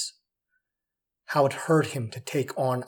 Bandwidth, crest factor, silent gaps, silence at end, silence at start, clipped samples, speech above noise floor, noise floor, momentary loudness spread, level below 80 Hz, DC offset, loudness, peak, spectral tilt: 19 kHz; 18 dB; none; 0 s; 0 s; under 0.1%; 62 dB; -87 dBFS; 9 LU; -78 dBFS; under 0.1%; -27 LUFS; -10 dBFS; -5.5 dB/octave